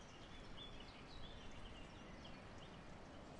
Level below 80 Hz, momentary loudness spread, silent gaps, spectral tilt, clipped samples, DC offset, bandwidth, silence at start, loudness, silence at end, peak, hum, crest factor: -62 dBFS; 3 LU; none; -4.5 dB/octave; under 0.1%; under 0.1%; 11 kHz; 0 s; -57 LUFS; 0 s; -42 dBFS; none; 14 dB